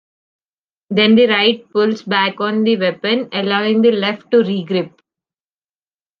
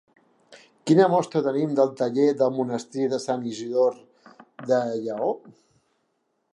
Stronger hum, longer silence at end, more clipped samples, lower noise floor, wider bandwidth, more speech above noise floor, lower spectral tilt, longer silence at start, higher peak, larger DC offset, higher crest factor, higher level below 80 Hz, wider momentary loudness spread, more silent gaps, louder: neither; first, 1.3 s vs 1.05 s; neither; first, under -90 dBFS vs -73 dBFS; second, 6.6 kHz vs 11 kHz; first, over 75 dB vs 50 dB; about the same, -7 dB/octave vs -6.5 dB/octave; first, 0.9 s vs 0.5 s; first, 0 dBFS vs -6 dBFS; neither; about the same, 16 dB vs 18 dB; first, -64 dBFS vs -78 dBFS; about the same, 8 LU vs 9 LU; neither; first, -15 LUFS vs -24 LUFS